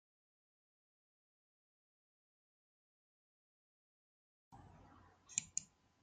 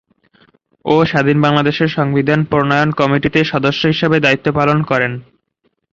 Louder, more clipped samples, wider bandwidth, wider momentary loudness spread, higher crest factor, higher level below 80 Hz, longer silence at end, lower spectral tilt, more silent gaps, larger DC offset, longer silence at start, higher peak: second, -43 LUFS vs -14 LUFS; neither; first, 9 kHz vs 7.4 kHz; first, 24 LU vs 4 LU; first, 38 dB vs 14 dB; second, -82 dBFS vs -46 dBFS; second, 0.35 s vs 0.7 s; second, 0 dB/octave vs -7 dB/octave; neither; neither; first, 4.5 s vs 0.85 s; second, -18 dBFS vs 0 dBFS